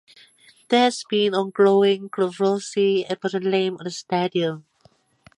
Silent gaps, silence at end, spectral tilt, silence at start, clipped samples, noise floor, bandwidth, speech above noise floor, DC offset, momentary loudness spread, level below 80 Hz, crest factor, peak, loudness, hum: none; 0.8 s; -5 dB/octave; 0.7 s; under 0.1%; -59 dBFS; 11 kHz; 38 dB; under 0.1%; 8 LU; -72 dBFS; 18 dB; -4 dBFS; -21 LUFS; none